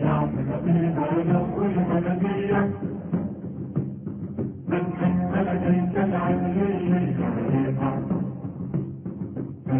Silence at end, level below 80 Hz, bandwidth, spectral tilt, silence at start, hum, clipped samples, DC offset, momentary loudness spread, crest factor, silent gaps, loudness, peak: 0 s; -50 dBFS; 3.4 kHz; -13 dB/octave; 0 s; none; under 0.1%; under 0.1%; 10 LU; 14 dB; none; -25 LUFS; -10 dBFS